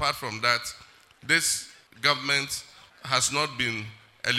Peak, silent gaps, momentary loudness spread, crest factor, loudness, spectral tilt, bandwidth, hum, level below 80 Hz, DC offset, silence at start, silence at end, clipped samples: -6 dBFS; none; 20 LU; 22 dB; -25 LUFS; -1.5 dB/octave; 16 kHz; none; -62 dBFS; under 0.1%; 0 s; 0 s; under 0.1%